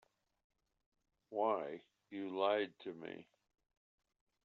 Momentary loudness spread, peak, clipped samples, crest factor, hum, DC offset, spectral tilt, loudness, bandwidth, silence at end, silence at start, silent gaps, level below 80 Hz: 16 LU; -22 dBFS; under 0.1%; 22 dB; none; under 0.1%; -2.5 dB/octave; -40 LUFS; 6.6 kHz; 1.2 s; 1.3 s; none; under -90 dBFS